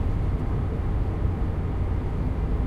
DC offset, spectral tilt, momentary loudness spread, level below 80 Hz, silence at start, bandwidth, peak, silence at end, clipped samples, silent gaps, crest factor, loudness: under 0.1%; -9.5 dB/octave; 1 LU; -28 dBFS; 0 s; 5.2 kHz; -12 dBFS; 0 s; under 0.1%; none; 12 dB; -28 LUFS